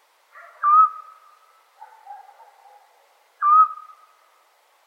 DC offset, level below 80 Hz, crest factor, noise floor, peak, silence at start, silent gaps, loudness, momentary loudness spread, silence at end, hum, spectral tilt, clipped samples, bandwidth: under 0.1%; under -90 dBFS; 18 dB; -60 dBFS; -6 dBFS; 0.6 s; none; -17 LUFS; 25 LU; 1.1 s; none; 3 dB/octave; under 0.1%; 4.4 kHz